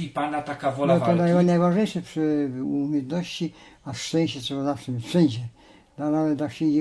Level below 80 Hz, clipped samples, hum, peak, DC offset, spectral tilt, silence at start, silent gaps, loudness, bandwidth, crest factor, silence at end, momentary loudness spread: -62 dBFS; under 0.1%; none; -6 dBFS; under 0.1%; -7 dB/octave; 0 s; none; -24 LUFS; 11 kHz; 18 dB; 0 s; 12 LU